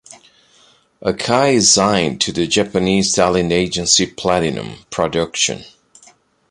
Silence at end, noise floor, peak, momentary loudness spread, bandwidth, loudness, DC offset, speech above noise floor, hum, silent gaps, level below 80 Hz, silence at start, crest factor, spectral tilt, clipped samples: 0.8 s; -53 dBFS; 0 dBFS; 11 LU; 11.5 kHz; -15 LUFS; under 0.1%; 36 dB; none; none; -44 dBFS; 0.1 s; 18 dB; -3 dB/octave; under 0.1%